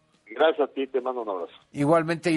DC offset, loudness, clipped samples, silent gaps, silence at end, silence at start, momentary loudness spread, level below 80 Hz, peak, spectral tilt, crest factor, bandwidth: under 0.1%; -25 LUFS; under 0.1%; none; 0 s; 0.3 s; 12 LU; -70 dBFS; -8 dBFS; -6.5 dB/octave; 18 dB; 11.5 kHz